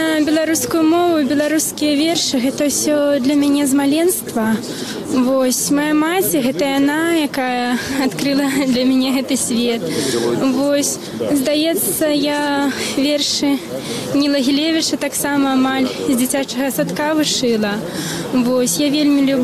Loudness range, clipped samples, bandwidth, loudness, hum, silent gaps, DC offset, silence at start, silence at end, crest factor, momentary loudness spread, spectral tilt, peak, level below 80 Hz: 2 LU; under 0.1%; 15 kHz; -16 LUFS; none; none; under 0.1%; 0 s; 0 s; 10 dB; 4 LU; -3.5 dB/octave; -6 dBFS; -52 dBFS